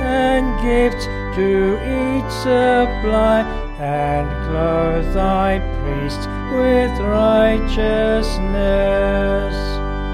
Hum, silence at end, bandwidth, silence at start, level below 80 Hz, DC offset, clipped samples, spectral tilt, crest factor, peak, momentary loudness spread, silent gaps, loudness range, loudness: none; 0 s; 13.5 kHz; 0 s; -24 dBFS; under 0.1%; under 0.1%; -6.5 dB/octave; 14 dB; -2 dBFS; 8 LU; none; 2 LU; -18 LUFS